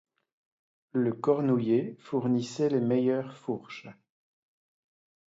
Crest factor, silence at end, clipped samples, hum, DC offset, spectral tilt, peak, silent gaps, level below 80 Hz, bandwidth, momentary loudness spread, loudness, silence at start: 18 dB; 1.4 s; under 0.1%; none; under 0.1%; -7.5 dB/octave; -12 dBFS; none; -78 dBFS; 7.8 kHz; 11 LU; -29 LUFS; 0.95 s